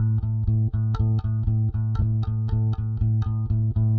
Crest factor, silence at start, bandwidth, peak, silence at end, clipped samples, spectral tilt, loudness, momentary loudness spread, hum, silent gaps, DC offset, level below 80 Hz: 10 dB; 0 s; 4 kHz; -12 dBFS; 0 s; under 0.1%; -11 dB/octave; -24 LUFS; 2 LU; none; none; under 0.1%; -34 dBFS